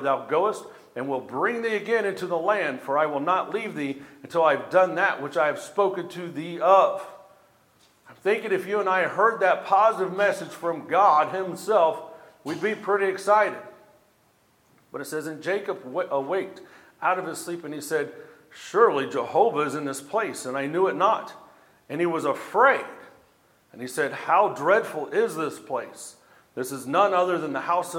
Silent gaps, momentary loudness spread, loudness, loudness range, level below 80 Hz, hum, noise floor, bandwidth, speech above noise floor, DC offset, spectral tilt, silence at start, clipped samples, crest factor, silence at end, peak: none; 14 LU; -24 LUFS; 6 LU; -80 dBFS; none; -63 dBFS; 17.5 kHz; 39 dB; under 0.1%; -4.5 dB/octave; 0 s; under 0.1%; 20 dB; 0 s; -4 dBFS